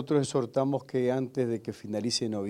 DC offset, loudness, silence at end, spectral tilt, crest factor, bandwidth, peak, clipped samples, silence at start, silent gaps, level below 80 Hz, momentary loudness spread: under 0.1%; -30 LUFS; 0 s; -5.5 dB/octave; 16 dB; 13 kHz; -14 dBFS; under 0.1%; 0 s; none; -72 dBFS; 6 LU